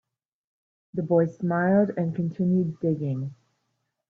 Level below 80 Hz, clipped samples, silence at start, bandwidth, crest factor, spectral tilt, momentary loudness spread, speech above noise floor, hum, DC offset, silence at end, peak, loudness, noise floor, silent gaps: -68 dBFS; under 0.1%; 0.95 s; 2.9 kHz; 16 dB; -11 dB/octave; 11 LU; 53 dB; none; under 0.1%; 0.75 s; -10 dBFS; -25 LUFS; -77 dBFS; none